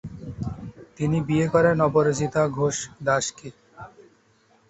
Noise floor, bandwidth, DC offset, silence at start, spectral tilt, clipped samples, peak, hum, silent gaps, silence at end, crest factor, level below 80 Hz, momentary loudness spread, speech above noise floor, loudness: -61 dBFS; 8.2 kHz; under 0.1%; 0.05 s; -5.5 dB/octave; under 0.1%; -6 dBFS; none; none; 0.8 s; 18 dB; -50 dBFS; 24 LU; 38 dB; -23 LUFS